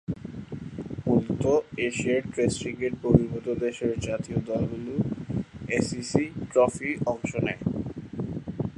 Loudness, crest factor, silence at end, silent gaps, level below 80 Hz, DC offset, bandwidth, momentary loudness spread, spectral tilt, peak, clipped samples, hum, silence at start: -28 LUFS; 26 dB; 0 s; none; -48 dBFS; under 0.1%; 11 kHz; 12 LU; -6.5 dB/octave; -2 dBFS; under 0.1%; none; 0.1 s